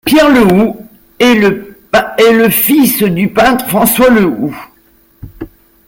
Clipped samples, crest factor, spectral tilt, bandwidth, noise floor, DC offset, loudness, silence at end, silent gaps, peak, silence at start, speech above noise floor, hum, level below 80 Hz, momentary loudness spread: under 0.1%; 10 dB; -4.5 dB/octave; 17.5 kHz; -48 dBFS; under 0.1%; -9 LUFS; 0.4 s; none; 0 dBFS; 0.05 s; 40 dB; none; -38 dBFS; 22 LU